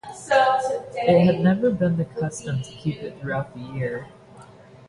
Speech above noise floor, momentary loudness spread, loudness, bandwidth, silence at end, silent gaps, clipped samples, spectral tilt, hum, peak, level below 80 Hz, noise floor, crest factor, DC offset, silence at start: 24 dB; 12 LU; -23 LUFS; 11.5 kHz; 0.45 s; none; under 0.1%; -6.5 dB/octave; none; -4 dBFS; -54 dBFS; -46 dBFS; 18 dB; under 0.1%; 0.05 s